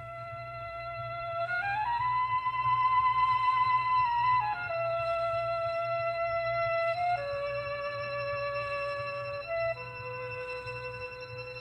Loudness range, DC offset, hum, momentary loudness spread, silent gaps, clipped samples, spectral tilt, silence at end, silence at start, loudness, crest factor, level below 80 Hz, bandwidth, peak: 7 LU; under 0.1%; none; 13 LU; none; under 0.1%; -5 dB/octave; 0 s; 0 s; -31 LUFS; 14 dB; -58 dBFS; 9.4 kHz; -18 dBFS